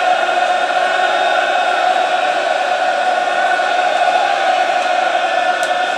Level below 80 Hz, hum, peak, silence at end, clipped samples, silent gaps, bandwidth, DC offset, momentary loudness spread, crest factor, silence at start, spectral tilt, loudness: -72 dBFS; none; 0 dBFS; 0 s; under 0.1%; none; 12 kHz; under 0.1%; 2 LU; 14 dB; 0 s; -0.5 dB/octave; -15 LUFS